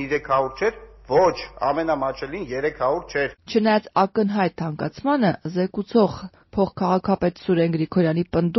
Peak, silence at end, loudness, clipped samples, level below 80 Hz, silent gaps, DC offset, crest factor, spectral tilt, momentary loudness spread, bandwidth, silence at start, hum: -6 dBFS; 0 s; -22 LUFS; under 0.1%; -50 dBFS; none; under 0.1%; 16 dB; -5.5 dB/octave; 7 LU; 6.2 kHz; 0 s; none